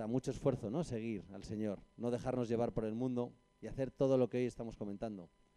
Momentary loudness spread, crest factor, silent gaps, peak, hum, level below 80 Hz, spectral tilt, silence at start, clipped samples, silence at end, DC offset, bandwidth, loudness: 12 LU; 16 dB; none; -22 dBFS; none; -60 dBFS; -7.5 dB/octave; 0 s; under 0.1%; 0.3 s; under 0.1%; 11 kHz; -39 LUFS